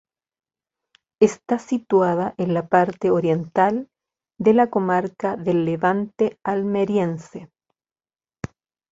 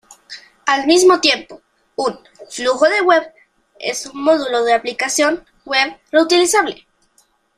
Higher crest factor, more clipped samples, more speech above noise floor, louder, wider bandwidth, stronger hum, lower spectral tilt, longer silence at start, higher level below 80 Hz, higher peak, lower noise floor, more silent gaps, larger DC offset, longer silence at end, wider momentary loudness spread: about the same, 20 dB vs 16 dB; neither; first, over 70 dB vs 43 dB; second, -21 LUFS vs -16 LUFS; second, 8 kHz vs 15 kHz; neither; first, -7.5 dB/octave vs -1 dB/octave; first, 1.2 s vs 0.1 s; about the same, -60 dBFS vs -60 dBFS; about the same, -2 dBFS vs 0 dBFS; first, under -90 dBFS vs -59 dBFS; neither; neither; first, 1.45 s vs 0.85 s; about the same, 13 LU vs 15 LU